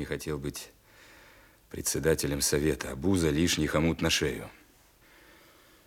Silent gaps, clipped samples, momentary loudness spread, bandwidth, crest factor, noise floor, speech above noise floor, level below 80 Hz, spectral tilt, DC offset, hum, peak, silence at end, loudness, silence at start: none; under 0.1%; 15 LU; 18 kHz; 18 dB; -60 dBFS; 31 dB; -48 dBFS; -4 dB/octave; under 0.1%; none; -12 dBFS; 1.35 s; -28 LUFS; 0 s